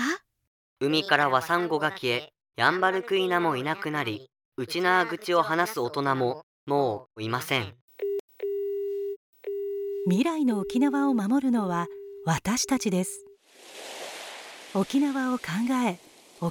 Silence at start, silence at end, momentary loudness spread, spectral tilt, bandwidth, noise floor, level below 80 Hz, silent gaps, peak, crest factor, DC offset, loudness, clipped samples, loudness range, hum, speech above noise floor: 0 s; 0 s; 14 LU; -4.5 dB/octave; 19.5 kHz; -50 dBFS; -66 dBFS; 0.47-0.76 s, 4.45-4.52 s, 6.43-6.67 s, 7.81-7.88 s, 8.20-8.28 s, 9.16-9.33 s; -4 dBFS; 22 dB; under 0.1%; -27 LUFS; under 0.1%; 5 LU; none; 24 dB